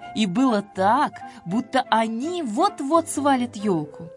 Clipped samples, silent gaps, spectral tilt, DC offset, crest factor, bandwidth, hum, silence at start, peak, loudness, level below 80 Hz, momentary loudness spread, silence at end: under 0.1%; none; -5 dB/octave; under 0.1%; 18 dB; 11.5 kHz; none; 0 s; -4 dBFS; -22 LUFS; -66 dBFS; 7 LU; 0 s